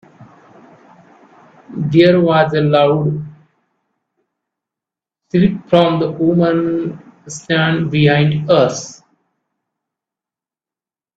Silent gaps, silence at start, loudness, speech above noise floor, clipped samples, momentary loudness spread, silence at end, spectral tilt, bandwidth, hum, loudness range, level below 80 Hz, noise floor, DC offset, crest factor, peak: none; 0.2 s; -14 LUFS; over 77 dB; under 0.1%; 16 LU; 2.25 s; -6.5 dB/octave; 8 kHz; none; 4 LU; -52 dBFS; under -90 dBFS; under 0.1%; 16 dB; 0 dBFS